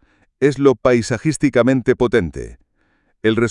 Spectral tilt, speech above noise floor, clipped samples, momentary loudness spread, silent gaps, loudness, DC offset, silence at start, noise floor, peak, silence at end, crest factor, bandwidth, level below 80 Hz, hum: -6 dB/octave; 46 dB; under 0.1%; 9 LU; none; -17 LUFS; under 0.1%; 0.4 s; -62 dBFS; 0 dBFS; 0 s; 18 dB; 11 kHz; -42 dBFS; none